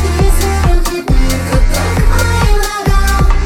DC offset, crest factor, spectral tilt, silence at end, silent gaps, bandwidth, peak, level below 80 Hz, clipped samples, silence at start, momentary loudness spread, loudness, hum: under 0.1%; 10 dB; -5 dB/octave; 0 s; none; 16.5 kHz; 0 dBFS; -12 dBFS; under 0.1%; 0 s; 2 LU; -13 LUFS; none